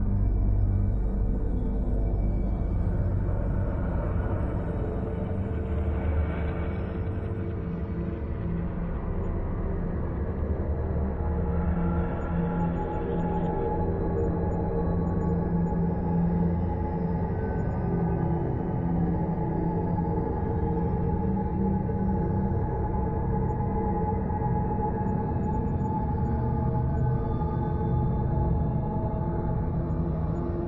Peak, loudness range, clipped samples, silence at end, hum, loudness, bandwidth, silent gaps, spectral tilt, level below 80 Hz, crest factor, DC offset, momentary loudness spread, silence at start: -14 dBFS; 3 LU; under 0.1%; 0 s; none; -29 LUFS; 3.9 kHz; none; -12 dB/octave; -32 dBFS; 12 dB; under 0.1%; 4 LU; 0 s